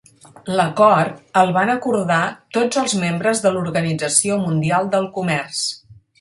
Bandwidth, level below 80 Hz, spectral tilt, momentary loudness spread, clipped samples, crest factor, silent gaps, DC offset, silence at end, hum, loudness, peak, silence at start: 11.5 kHz; -60 dBFS; -4 dB/octave; 8 LU; under 0.1%; 18 dB; none; under 0.1%; 0.25 s; none; -18 LUFS; 0 dBFS; 0.45 s